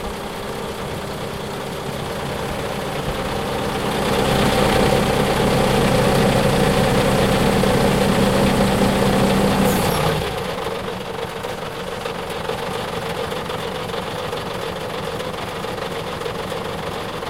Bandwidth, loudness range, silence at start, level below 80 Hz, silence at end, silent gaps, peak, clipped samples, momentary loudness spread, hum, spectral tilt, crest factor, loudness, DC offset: 16 kHz; 9 LU; 0 s; -34 dBFS; 0 s; none; -4 dBFS; under 0.1%; 10 LU; none; -5 dB/octave; 16 dB; -20 LUFS; 0.4%